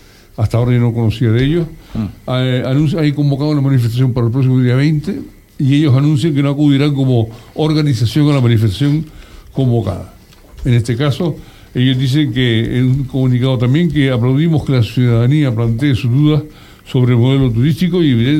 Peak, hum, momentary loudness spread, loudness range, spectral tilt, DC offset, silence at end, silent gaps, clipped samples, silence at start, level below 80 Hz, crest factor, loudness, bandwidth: 0 dBFS; none; 8 LU; 3 LU; -8 dB/octave; under 0.1%; 0 s; none; under 0.1%; 0.4 s; -36 dBFS; 12 dB; -14 LUFS; 13.5 kHz